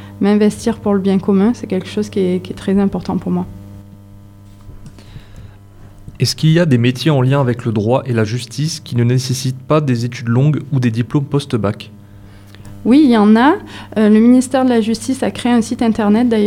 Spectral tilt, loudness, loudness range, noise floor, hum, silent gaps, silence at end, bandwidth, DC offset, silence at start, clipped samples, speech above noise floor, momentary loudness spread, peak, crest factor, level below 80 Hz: -6.5 dB/octave; -15 LUFS; 9 LU; -38 dBFS; none; none; 0 s; 14 kHz; under 0.1%; 0 s; under 0.1%; 25 dB; 10 LU; 0 dBFS; 14 dB; -44 dBFS